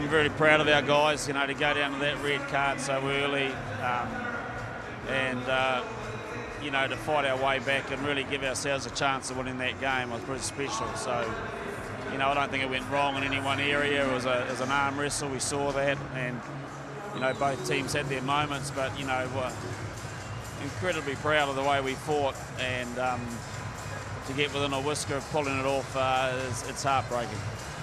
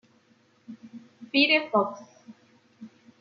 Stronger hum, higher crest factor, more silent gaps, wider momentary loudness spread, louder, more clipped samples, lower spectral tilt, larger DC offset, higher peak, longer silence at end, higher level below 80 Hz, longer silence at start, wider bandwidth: neither; about the same, 24 dB vs 22 dB; neither; second, 11 LU vs 27 LU; second, -29 LUFS vs -23 LUFS; neither; about the same, -4 dB/octave vs -4.5 dB/octave; neither; about the same, -6 dBFS vs -8 dBFS; second, 0 s vs 0.35 s; first, -52 dBFS vs -84 dBFS; second, 0 s vs 0.7 s; first, 13.5 kHz vs 6.8 kHz